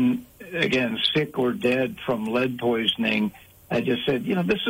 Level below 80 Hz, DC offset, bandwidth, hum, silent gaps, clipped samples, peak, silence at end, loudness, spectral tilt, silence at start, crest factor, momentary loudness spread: -58 dBFS; under 0.1%; 16 kHz; none; none; under 0.1%; -6 dBFS; 0 s; -24 LUFS; -6 dB/octave; 0 s; 18 dB; 6 LU